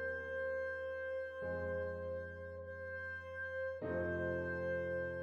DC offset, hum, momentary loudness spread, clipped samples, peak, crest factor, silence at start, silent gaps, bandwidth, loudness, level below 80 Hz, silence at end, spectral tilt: under 0.1%; none; 7 LU; under 0.1%; -26 dBFS; 14 dB; 0 s; none; 6.6 kHz; -42 LUFS; -62 dBFS; 0 s; -8 dB/octave